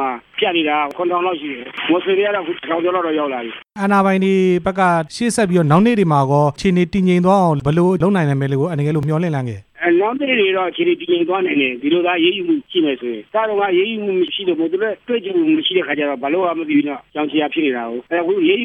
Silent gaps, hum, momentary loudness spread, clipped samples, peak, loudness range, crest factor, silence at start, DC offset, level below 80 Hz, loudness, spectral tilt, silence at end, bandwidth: none; none; 7 LU; under 0.1%; -2 dBFS; 3 LU; 16 dB; 0 s; under 0.1%; -50 dBFS; -17 LUFS; -6.5 dB/octave; 0 s; 12 kHz